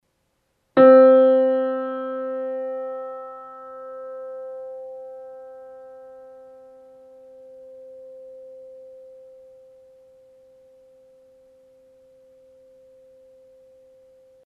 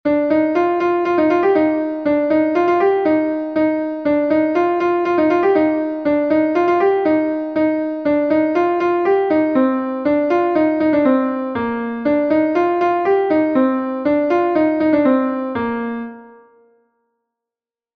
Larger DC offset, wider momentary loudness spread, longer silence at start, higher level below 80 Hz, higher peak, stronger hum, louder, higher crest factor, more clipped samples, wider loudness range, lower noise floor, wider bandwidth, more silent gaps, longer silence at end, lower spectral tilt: neither; first, 30 LU vs 5 LU; first, 0.75 s vs 0.05 s; second, -74 dBFS vs -56 dBFS; about the same, -2 dBFS vs -2 dBFS; neither; about the same, -18 LUFS vs -17 LUFS; first, 22 dB vs 14 dB; neither; first, 27 LU vs 2 LU; second, -71 dBFS vs -89 dBFS; second, 4.3 kHz vs 6.2 kHz; neither; first, 6.15 s vs 1.65 s; about the same, -8 dB/octave vs -7.5 dB/octave